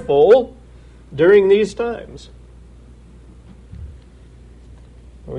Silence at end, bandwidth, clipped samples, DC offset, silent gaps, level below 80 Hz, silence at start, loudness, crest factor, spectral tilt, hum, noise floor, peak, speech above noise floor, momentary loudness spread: 0 s; 9.6 kHz; under 0.1%; under 0.1%; none; -42 dBFS; 0 s; -14 LUFS; 16 dB; -6.5 dB/octave; none; -43 dBFS; -2 dBFS; 28 dB; 26 LU